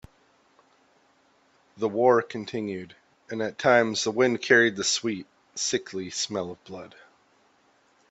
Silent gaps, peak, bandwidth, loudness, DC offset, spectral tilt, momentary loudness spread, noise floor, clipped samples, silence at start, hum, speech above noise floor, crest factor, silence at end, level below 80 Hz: none; -6 dBFS; 8.4 kHz; -25 LUFS; under 0.1%; -3 dB/octave; 18 LU; -64 dBFS; under 0.1%; 1.75 s; none; 38 dB; 22 dB; 1.25 s; -68 dBFS